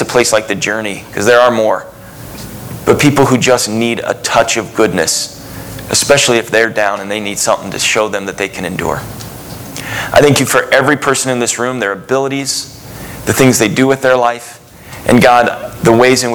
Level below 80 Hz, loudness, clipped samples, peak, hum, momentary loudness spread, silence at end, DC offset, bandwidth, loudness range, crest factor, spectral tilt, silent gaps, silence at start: -42 dBFS; -12 LUFS; 0.5%; 0 dBFS; none; 18 LU; 0 s; under 0.1%; over 20 kHz; 2 LU; 12 dB; -3.5 dB/octave; none; 0 s